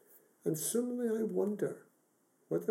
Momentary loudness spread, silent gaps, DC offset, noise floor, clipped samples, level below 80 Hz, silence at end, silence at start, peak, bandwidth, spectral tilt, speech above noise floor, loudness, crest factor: 6 LU; none; under 0.1%; -73 dBFS; under 0.1%; under -90 dBFS; 0 s; 0.15 s; -20 dBFS; 16 kHz; -5.5 dB/octave; 39 dB; -36 LUFS; 16 dB